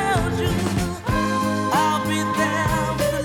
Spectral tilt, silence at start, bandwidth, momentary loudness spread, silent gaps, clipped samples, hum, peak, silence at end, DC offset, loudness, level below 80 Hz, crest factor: -5 dB/octave; 0 s; over 20 kHz; 3 LU; none; under 0.1%; none; -8 dBFS; 0 s; under 0.1%; -21 LUFS; -36 dBFS; 14 dB